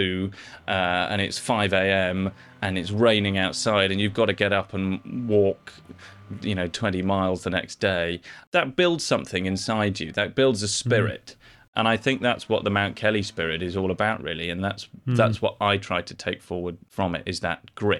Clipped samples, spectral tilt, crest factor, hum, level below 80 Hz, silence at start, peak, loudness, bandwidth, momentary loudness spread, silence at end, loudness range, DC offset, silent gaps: under 0.1%; -5 dB/octave; 18 dB; none; -56 dBFS; 0 s; -6 dBFS; -24 LUFS; 13 kHz; 9 LU; 0 s; 3 LU; under 0.1%; 8.47-8.52 s, 11.68-11.73 s